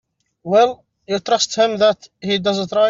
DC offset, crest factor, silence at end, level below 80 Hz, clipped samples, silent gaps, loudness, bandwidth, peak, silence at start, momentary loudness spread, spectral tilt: under 0.1%; 14 dB; 0 s; -60 dBFS; under 0.1%; none; -18 LUFS; 7.6 kHz; -2 dBFS; 0.45 s; 11 LU; -3.5 dB/octave